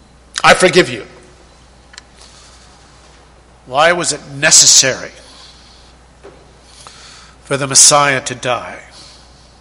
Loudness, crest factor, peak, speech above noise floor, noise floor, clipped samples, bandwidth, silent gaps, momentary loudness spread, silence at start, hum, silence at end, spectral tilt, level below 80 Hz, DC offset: -9 LUFS; 16 dB; 0 dBFS; 32 dB; -44 dBFS; 0.4%; 16 kHz; none; 20 LU; 0.35 s; none; 0.8 s; -1 dB/octave; -46 dBFS; under 0.1%